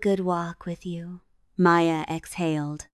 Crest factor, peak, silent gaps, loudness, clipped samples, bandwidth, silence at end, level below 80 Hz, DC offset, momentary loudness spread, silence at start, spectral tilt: 18 dB; -8 dBFS; none; -25 LUFS; under 0.1%; 13 kHz; 0.15 s; -58 dBFS; under 0.1%; 17 LU; 0 s; -6.5 dB/octave